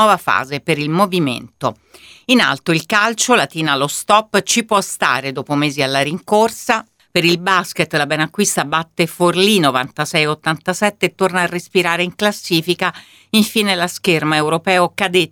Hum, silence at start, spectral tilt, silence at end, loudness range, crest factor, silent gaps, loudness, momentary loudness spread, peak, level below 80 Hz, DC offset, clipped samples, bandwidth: none; 0 s; -3.5 dB/octave; 0.05 s; 2 LU; 16 dB; none; -16 LUFS; 6 LU; 0 dBFS; -60 dBFS; under 0.1%; under 0.1%; 19 kHz